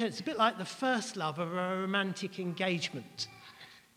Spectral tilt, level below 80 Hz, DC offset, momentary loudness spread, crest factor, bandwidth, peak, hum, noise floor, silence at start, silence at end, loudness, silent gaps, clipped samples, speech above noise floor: -4.5 dB/octave; -78 dBFS; under 0.1%; 11 LU; 20 dB; 16 kHz; -14 dBFS; none; -55 dBFS; 0 s; 0.15 s; -34 LUFS; none; under 0.1%; 21 dB